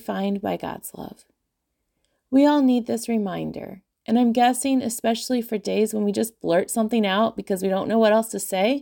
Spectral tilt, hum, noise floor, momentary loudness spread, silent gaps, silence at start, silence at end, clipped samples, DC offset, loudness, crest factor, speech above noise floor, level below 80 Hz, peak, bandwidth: -4.5 dB/octave; none; -77 dBFS; 14 LU; none; 0.1 s; 0 s; under 0.1%; under 0.1%; -22 LUFS; 16 dB; 56 dB; -62 dBFS; -6 dBFS; 17 kHz